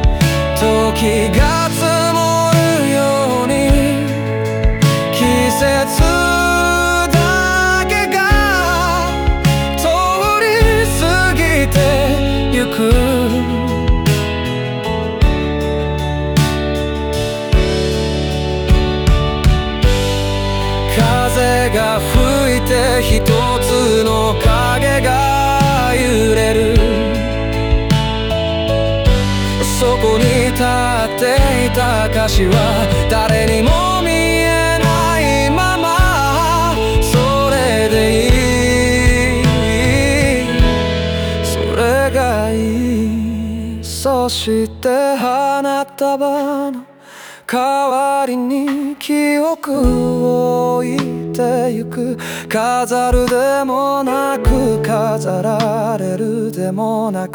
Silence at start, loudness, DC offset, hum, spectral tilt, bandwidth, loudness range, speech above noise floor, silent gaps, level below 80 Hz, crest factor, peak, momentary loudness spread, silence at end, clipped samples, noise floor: 0 s; -14 LUFS; under 0.1%; none; -5 dB/octave; over 20 kHz; 4 LU; 22 dB; none; -22 dBFS; 12 dB; -2 dBFS; 6 LU; 0 s; under 0.1%; -37 dBFS